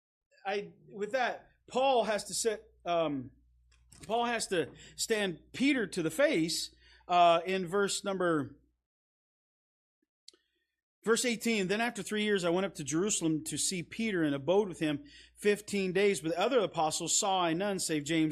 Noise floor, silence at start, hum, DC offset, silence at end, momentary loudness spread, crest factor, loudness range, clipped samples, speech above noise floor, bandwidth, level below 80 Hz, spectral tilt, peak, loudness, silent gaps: -73 dBFS; 0.45 s; none; under 0.1%; 0 s; 9 LU; 18 dB; 5 LU; under 0.1%; 42 dB; 15 kHz; -68 dBFS; -3.5 dB/octave; -14 dBFS; -31 LUFS; 8.86-10.02 s, 10.09-10.27 s, 10.83-11.02 s